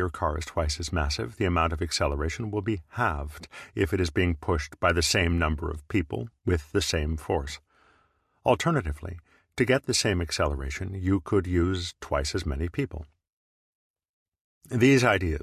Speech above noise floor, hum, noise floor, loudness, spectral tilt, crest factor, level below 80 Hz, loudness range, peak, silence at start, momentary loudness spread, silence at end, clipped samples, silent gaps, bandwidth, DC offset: 41 dB; none; -67 dBFS; -27 LUFS; -5 dB/octave; 20 dB; -36 dBFS; 3 LU; -6 dBFS; 0 s; 11 LU; 0 s; under 0.1%; 13.33-13.94 s, 14.09-14.26 s, 14.41-14.61 s; 14 kHz; under 0.1%